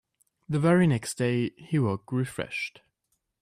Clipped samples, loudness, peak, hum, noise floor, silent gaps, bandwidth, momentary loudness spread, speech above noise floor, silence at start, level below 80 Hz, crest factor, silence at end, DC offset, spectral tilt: under 0.1%; -27 LUFS; -10 dBFS; none; -78 dBFS; none; 14.5 kHz; 10 LU; 52 dB; 0.5 s; -62 dBFS; 18 dB; 0.75 s; under 0.1%; -6.5 dB/octave